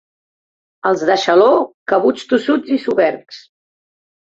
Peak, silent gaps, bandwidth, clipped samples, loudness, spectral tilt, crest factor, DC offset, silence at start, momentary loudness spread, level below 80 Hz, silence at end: -2 dBFS; 1.74-1.86 s; 7.8 kHz; under 0.1%; -15 LUFS; -4.5 dB/octave; 16 dB; under 0.1%; 0.85 s; 7 LU; -62 dBFS; 0.85 s